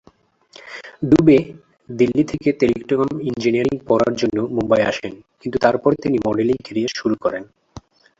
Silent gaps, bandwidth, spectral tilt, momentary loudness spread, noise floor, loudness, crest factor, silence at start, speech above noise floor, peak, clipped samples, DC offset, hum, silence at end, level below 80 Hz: none; 7.8 kHz; -6.5 dB/octave; 16 LU; -54 dBFS; -18 LUFS; 18 dB; 0.65 s; 37 dB; -2 dBFS; under 0.1%; under 0.1%; none; 0.4 s; -48 dBFS